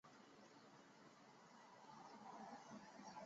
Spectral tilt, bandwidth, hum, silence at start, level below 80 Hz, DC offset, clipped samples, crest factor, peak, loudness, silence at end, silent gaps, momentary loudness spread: -3.5 dB/octave; 7.6 kHz; none; 0.05 s; under -90 dBFS; under 0.1%; under 0.1%; 16 dB; -46 dBFS; -62 LUFS; 0 s; none; 8 LU